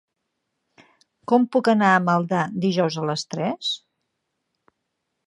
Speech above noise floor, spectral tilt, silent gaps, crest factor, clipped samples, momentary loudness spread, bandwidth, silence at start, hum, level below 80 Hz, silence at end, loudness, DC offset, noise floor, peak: 57 dB; -5.5 dB/octave; none; 20 dB; under 0.1%; 10 LU; 11.5 kHz; 1.3 s; none; -72 dBFS; 1.5 s; -21 LUFS; under 0.1%; -78 dBFS; -4 dBFS